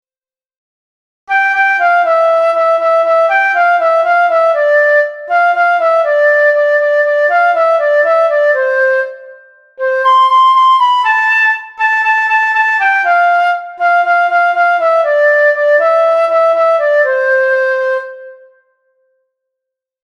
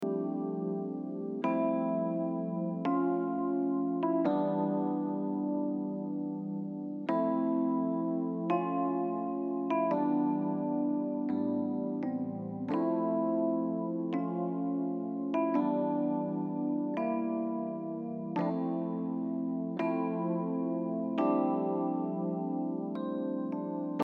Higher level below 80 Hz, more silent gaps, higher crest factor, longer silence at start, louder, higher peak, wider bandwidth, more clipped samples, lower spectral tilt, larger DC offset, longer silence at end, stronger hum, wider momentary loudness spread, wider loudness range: first, -68 dBFS vs -86 dBFS; neither; second, 10 dB vs 16 dB; first, 1.3 s vs 0 s; first, -10 LUFS vs -33 LUFS; first, 0 dBFS vs -16 dBFS; first, 7.8 kHz vs 4.7 kHz; neither; second, 0 dB/octave vs -10.5 dB/octave; neither; first, 1.7 s vs 0 s; neither; about the same, 4 LU vs 6 LU; about the same, 2 LU vs 2 LU